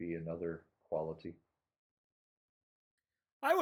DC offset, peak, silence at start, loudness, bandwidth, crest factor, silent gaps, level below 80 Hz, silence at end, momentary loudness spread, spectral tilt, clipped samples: under 0.1%; -18 dBFS; 0 s; -41 LUFS; 16.5 kHz; 24 dB; 1.78-2.98 s, 3.32-3.40 s; -72 dBFS; 0 s; 12 LU; -6 dB/octave; under 0.1%